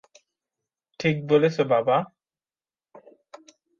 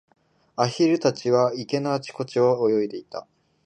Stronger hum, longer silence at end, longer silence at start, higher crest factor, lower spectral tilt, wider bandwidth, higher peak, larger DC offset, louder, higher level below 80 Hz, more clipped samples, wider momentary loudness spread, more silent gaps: neither; first, 0.8 s vs 0.45 s; first, 1 s vs 0.6 s; about the same, 20 dB vs 18 dB; about the same, -7 dB/octave vs -6 dB/octave; second, 7.2 kHz vs 9.4 kHz; about the same, -6 dBFS vs -6 dBFS; neither; about the same, -23 LUFS vs -23 LUFS; about the same, -70 dBFS vs -72 dBFS; neither; second, 6 LU vs 15 LU; neither